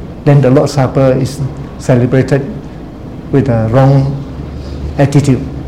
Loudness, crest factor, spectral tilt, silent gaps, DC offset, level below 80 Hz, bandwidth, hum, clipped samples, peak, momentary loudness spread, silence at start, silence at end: -11 LUFS; 12 dB; -8 dB/octave; none; 0.8%; -30 dBFS; 11 kHz; none; 0.6%; 0 dBFS; 16 LU; 0 s; 0 s